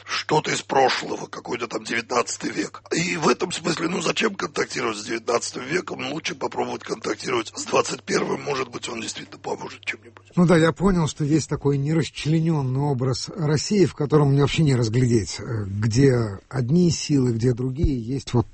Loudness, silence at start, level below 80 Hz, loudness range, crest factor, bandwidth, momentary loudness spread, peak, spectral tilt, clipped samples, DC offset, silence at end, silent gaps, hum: -23 LUFS; 0.05 s; -42 dBFS; 5 LU; 18 dB; 8.8 kHz; 10 LU; -4 dBFS; -5.5 dB/octave; under 0.1%; under 0.1%; 0 s; none; none